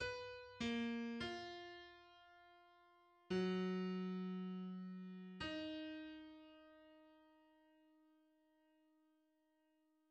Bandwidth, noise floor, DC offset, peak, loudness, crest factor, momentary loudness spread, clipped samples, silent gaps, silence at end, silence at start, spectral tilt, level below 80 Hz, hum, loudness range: 8.8 kHz; -81 dBFS; under 0.1%; -32 dBFS; -46 LUFS; 18 dB; 23 LU; under 0.1%; none; 2.75 s; 0 s; -6 dB/octave; -76 dBFS; none; 12 LU